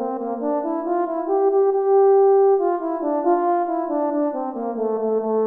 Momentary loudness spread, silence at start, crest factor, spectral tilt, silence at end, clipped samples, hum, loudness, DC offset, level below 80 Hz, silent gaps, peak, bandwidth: 9 LU; 0 s; 12 dB; -10.5 dB/octave; 0 s; under 0.1%; none; -20 LUFS; under 0.1%; -68 dBFS; none; -8 dBFS; 2.2 kHz